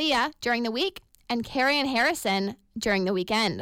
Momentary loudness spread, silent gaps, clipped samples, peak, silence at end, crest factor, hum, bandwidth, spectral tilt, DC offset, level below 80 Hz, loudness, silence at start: 8 LU; none; under 0.1%; -14 dBFS; 0 s; 12 dB; none; 17 kHz; -3.5 dB/octave; under 0.1%; -56 dBFS; -26 LUFS; 0 s